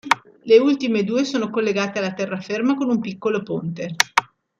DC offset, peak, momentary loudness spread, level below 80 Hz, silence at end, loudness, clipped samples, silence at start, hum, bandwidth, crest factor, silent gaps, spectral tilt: under 0.1%; 0 dBFS; 10 LU; -64 dBFS; 0.35 s; -21 LUFS; under 0.1%; 0.05 s; none; 16 kHz; 20 dB; none; -4.5 dB/octave